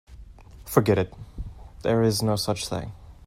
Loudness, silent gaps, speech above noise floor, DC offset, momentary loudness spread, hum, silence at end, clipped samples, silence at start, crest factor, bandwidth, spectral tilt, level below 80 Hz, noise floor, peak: -25 LUFS; none; 22 dB; under 0.1%; 19 LU; none; 0.15 s; under 0.1%; 0.1 s; 22 dB; 16 kHz; -5.5 dB/octave; -44 dBFS; -45 dBFS; -4 dBFS